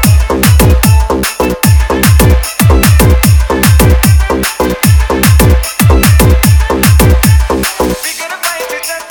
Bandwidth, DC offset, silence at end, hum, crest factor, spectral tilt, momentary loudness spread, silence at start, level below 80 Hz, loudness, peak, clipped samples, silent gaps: over 20 kHz; under 0.1%; 0 s; none; 8 dB; -5 dB/octave; 7 LU; 0 s; -12 dBFS; -8 LUFS; 0 dBFS; 1%; none